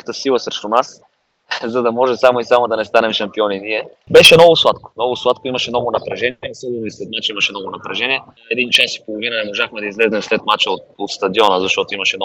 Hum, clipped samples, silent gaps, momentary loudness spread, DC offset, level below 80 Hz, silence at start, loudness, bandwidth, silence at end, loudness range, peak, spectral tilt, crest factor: none; 0.5%; none; 13 LU; under 0.1%; -54 dBFS; 0.05 s; -15 LUFS; over 20 kHz; 0 s; 8 LU; 0 dBFS; -3 dB/octave; 16 dB